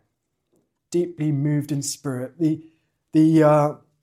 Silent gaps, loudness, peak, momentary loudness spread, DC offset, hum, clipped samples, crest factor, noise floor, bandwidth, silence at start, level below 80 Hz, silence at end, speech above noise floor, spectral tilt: none; -21 LUFS; -6 dBFS; 12 LU; under 0.1%; none; under 0.1%; 16 dB; -75 dBFS; 15 kHz; 0.9 s; -68 dBFS; 0.25 s; 55 dB; -7 dB/octave